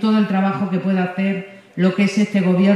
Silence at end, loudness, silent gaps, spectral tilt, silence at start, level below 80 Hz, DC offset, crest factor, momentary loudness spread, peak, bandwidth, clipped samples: 0 s; -19 LUFS; none; -7.5 dB/octave; 0 s; -68 dBFS; under 0.1%; 14 dB; 6 LU; -4 dBFS; 9.8 kHz; under 0.1%